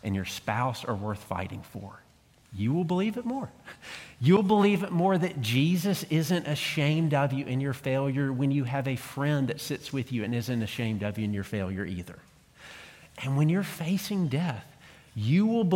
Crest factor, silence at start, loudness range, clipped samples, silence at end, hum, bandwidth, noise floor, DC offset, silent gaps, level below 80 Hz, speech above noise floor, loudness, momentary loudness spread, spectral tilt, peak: 18 dB; 0.05 s; 7 LU; under 0.1%; 0 s; none; 17 kHz; -50 dBFS; under 0.1%; none; -62 dBFS; 22 dB; -28 LUFS; 17 LU; -6.5 dB/octave; -10 dBFS